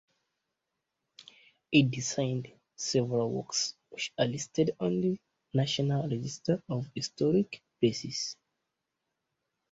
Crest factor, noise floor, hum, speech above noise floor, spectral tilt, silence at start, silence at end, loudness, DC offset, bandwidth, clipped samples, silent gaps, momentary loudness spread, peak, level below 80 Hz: 22 dB; -85 dBFS; none; 55 dB; -5 dB/octave; 1.2 s; 1.4 s; -31 LUFS; under 0.1%; 8 kHz; under 0.1%; none; 10 LU; -10 dBFS; -68 dBFS